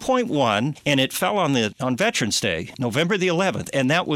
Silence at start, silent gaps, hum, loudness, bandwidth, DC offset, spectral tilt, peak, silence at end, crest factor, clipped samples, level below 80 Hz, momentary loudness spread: 0 s; none; none; -21 LUFS; 16.5 kHz; under 0.1%; -4 dB/octave; -6 dBFS; 0 s; 16 dB; under 0.1%; -56 dBFS; 4 LU